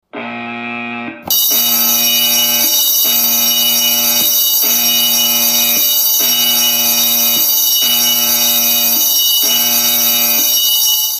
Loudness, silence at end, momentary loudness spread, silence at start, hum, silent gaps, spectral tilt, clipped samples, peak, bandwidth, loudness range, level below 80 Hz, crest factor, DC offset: -9 LUFS; 0 s; 4 LU; 0.15 s; none; none; 1 dB/octave; under 0.1%; 0 dBFS; 16 kHz; 1 LU; -62 dBFS; 12 dB; under 0.1%